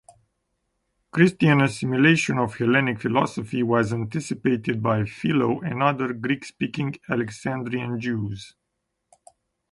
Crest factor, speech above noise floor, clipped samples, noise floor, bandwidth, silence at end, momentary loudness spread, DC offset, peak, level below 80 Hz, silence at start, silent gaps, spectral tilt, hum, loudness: 20 dB; 56 dB; under 0.1%; -78 dBFS; 11.5 kHz; 1.2 s; 10 LU; under 0.1%; -2 dBFS; -58 dBFS; 1.15 s; none; -6.5 dB/octave; none; -23 LUFS